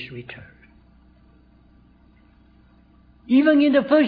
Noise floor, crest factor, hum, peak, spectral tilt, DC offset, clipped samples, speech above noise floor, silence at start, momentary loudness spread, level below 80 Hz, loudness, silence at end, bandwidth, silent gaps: -54 dBFS; 18 dB; none; -6 dBFS; -8.5 dB/octave; under 0.1%; under 0.1%; 36 dB; 0 s; 24 LU; -56 dBFS; -17 LUFS; 0 s; 4.9 kHz; none